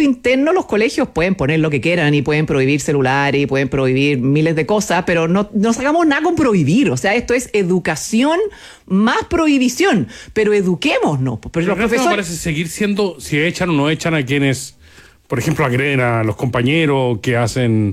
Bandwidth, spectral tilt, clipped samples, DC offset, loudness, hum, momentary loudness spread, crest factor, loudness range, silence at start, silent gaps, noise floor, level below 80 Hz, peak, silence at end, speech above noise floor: 15.5 kHz; -5.5 dB/octave; under 0.1%; under 0.1%; -16 LUFS; none; 5 LU; 12 dB; 2 LU; 0 s; none; -44 dBFS; -42 dBFS; -4 dBFS; 0 s; 29 dB